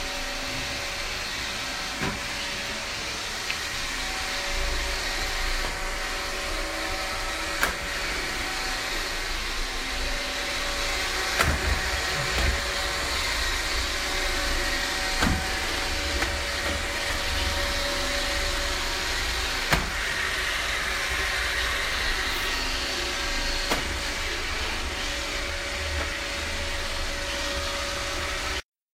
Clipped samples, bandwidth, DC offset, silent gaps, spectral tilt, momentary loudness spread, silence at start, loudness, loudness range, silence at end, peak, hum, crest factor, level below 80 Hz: under 0.1%; 16 kHz; under 0.1%; none; -2 dB/octave; 4 LU; 0 s; -27 LUFS; 3 LU; 0.35 s; -6 dBFS; none; 22 dB; -34 dBFS